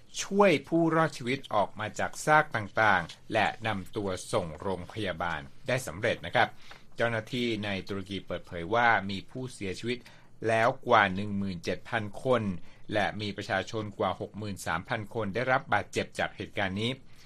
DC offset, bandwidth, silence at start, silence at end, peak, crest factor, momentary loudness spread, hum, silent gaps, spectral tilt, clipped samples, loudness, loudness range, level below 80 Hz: under 0.1%; 14 kHz; 0 s; 0 s; -8 dBFS; 22 dB; 12 LU; none; none; -5 dB/octave; under 0.1%; -30 LUFS; 4 LU; -56 dBFS